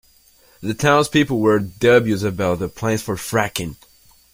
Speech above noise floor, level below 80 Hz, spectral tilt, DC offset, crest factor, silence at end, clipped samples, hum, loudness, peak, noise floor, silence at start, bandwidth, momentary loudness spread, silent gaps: 35 dB; -48 dBFS; -5 dB/octave; under 0.1%; 18 dB; 0.6 s; under 0.1%; none; -18 LUFS; -2 dBFS; -53 dBFS; 0.6 s; 16.5 kHz; 11 LU; none